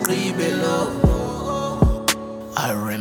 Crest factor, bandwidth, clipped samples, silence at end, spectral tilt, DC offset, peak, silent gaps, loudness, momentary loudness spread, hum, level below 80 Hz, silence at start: 18 dB; 19 kHz; under 0.1%; 0 s; -5 dB/octave; under 0.1%; -2 dBFS; none; -21 LUFS; 6 LU; none; -28 dBFS; 0 s